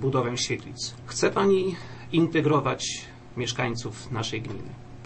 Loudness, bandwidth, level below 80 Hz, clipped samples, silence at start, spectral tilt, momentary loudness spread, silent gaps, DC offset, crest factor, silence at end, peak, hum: -27 LUFS; 8.8 kHz; -54 dBFS; under 0.1%; 0 s; -5 dB/octave; 14 LU; none; under 0.1%; 16 dB; 0 s; -10 dBFS; none